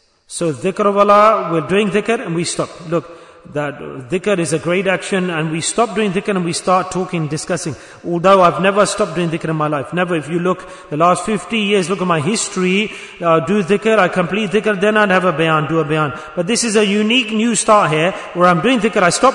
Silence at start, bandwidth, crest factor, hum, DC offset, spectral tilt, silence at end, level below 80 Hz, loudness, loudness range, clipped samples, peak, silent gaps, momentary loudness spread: 0.3 s; 11 kHz; 16 dB; none; under 0.1%; -4.5 dB/octave; 0 s; -52 dBFS; -15 LUFS; 4 LU; under 0.1%; 0 dBFS; none; 10 LU